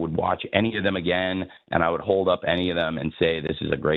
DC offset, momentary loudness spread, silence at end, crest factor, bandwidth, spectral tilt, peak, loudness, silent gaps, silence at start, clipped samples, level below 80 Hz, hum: under 0.1%; 5 LU; 0 s; 20 dB; 4.7 kHz; -8.5 dB/octave; -4 dBFS; -24 LUFS; none; 0 s; under 0.1%; -48 dBFS; none